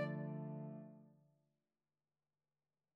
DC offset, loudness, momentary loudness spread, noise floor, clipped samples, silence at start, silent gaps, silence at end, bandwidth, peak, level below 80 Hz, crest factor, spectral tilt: under 0.1%; -48 LUFS; 16 LU; under -90 dBFS; under 0.1%; 0 s; none; 1.75 s; 4.8 kHz; -30 dBFS; under -90 dBFS; 20 dB; -8 dB/octave